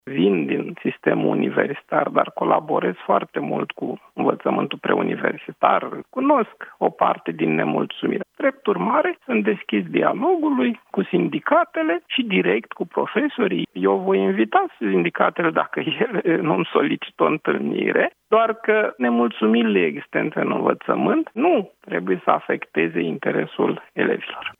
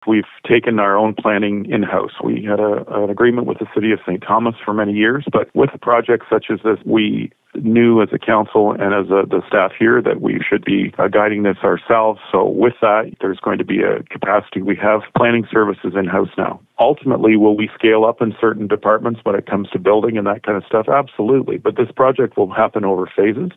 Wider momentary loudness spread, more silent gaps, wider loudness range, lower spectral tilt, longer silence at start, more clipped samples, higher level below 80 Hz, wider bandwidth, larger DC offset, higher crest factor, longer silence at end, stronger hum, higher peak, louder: about the same, 5 LU vs 6 LU; neither; about the same, 2 LU vs 2 LU; about the same, -8.5 dB/octave vs -9.5 dB/octave; about the same, 0.05 s vs 0.05 s; neither; second, -74 dBFS vs -56 dBFS; about the same, 3.9 kHz vs 3.9 kHz; neither; first, 20 dB vs 14 dB; about the same, 0.1 s vs 0.05 s; neither; about the same, 0 dBFS vs -2 dBFS; second, -21 LUFS vs -16 LUFS